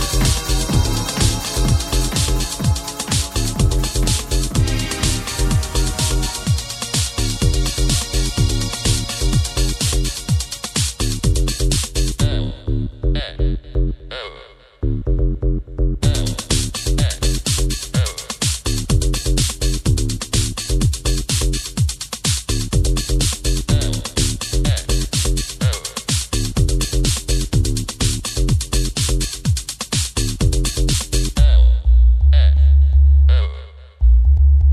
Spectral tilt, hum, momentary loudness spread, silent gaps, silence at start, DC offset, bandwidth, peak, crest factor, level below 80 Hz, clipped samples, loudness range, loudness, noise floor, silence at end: -4 dB/octave; none; 7 LU; none; 0 s; under 0.1%; 15 kHz; -2 dBFS; 14 dB; -18 dBFS; under 0.1%; 6 LU; -19 LUFS; -42 dBFS; 0 s